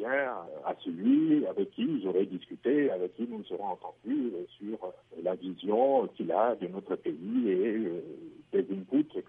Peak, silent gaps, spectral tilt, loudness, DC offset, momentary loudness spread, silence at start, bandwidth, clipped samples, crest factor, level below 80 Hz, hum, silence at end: -14 dBFS; none; -9.5 dB/octave; -31 LUFS; under 0.1%; 13 LU; 0 s; 3.8 kHz; under 0.1%; 18 dB; -80 dBFS; none; 0.05 s